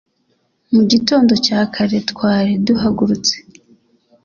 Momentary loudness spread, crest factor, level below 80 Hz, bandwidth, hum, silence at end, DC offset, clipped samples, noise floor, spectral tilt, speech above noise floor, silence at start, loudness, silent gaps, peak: 5 LU; 16 dB; -48 dBFS; 7.2 kHz; none; 0.85 s; under 0.1%; under 0.1%; -63 dBFS; -5 dB/octave; 49 dB; 0.7 s; -15 LUFS; none; 0 dBFS